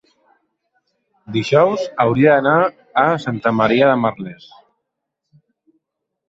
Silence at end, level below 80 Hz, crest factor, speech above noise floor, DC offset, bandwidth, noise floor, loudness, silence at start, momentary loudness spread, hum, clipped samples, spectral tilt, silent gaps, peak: 1.95 s; -58 dBFS; 16 dB; 62 dB; under 0.1%; 7.8 kHz; -78 dBFS; -16 LUFS; 1.3 s; 10 LU; none; under 0.1%; -7 dB/octave; none; -2 dBFS